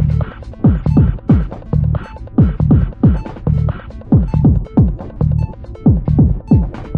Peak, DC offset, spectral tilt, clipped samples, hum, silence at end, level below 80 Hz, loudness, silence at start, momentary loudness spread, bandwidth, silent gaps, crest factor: 0 dBFS; under 0.1%; -11.5 dB/octave; under 0.1%; none; 0 s; -22 dBFS; -15 LUFS; 0 s; 7 LU; 4.6 kHz; none; 12 dB